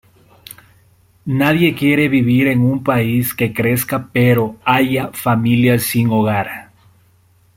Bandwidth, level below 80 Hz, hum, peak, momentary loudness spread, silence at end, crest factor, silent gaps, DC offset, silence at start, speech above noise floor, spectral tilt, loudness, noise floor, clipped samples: 16.5 kHz; -50 dBFS; none; 0 dBFS; 6 LU; 0.95 s; 16 dB; none; under 0.1%; 1.25 s; 39 dB; -6 dB/octave; -15 LUFS; -53 dBFS; under 0.1%